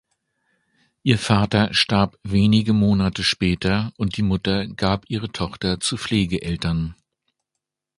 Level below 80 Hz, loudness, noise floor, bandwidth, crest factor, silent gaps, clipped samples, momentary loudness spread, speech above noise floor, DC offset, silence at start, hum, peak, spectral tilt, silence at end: -40 dBFS; -21 LUFS; -83 dBFS; 11.5 kHz; 20 dB; none; under 0.1%; 8 LU; 62 dB; under 0.1%; 1.05 s; none; 0 dBFS; -5.5 dB/octave; 1.05 s